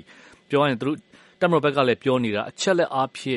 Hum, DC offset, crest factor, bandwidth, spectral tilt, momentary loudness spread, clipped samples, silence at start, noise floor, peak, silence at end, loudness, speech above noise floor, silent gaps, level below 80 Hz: none; under 0.1%; 18 dB; 11.5 kHz; -5 dB/octave; 7 LU; under 0.1%; 0.5 s; -50 dBFS; -4 dBFS; 0 s; -22 LUFS; 28 dB; none; -66 dBFS